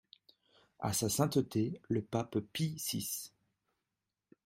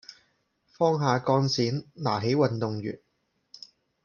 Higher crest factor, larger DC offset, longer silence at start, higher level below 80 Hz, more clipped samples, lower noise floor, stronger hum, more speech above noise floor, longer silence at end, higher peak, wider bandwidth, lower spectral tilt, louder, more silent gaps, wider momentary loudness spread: about the same, 22 dB vs 20 dB; neither; first, 0.8 s vs 0.1 s; about the same, -68 dBFS vs -68 dBFS; neither; first, -89 dBFS vs -74 dBFS; neither; first, 54 dB vs 49 dB; first, 1.15 s vs 0.45 s; second, -16 dBFS vs -8 dBFS; first, 16 kHz vs 7 kHz; about the same, -5 dB/octave vs -6 dB/octave; second, -35 LUFS vs -26 LUFS; neither; second, 8 LU vs 21 LU